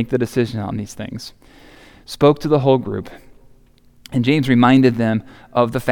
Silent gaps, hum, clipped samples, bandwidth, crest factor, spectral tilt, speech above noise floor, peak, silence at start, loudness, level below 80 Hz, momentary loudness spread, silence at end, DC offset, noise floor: none; none; under 0.1%; 17 kHz; 16 dB; -7 dB/octave; 33 dB; -2 dBFS; 0 s; -17 LUFS; -48 dBFS; 17 LU; 0 s; under 0.1%; -50 dBFS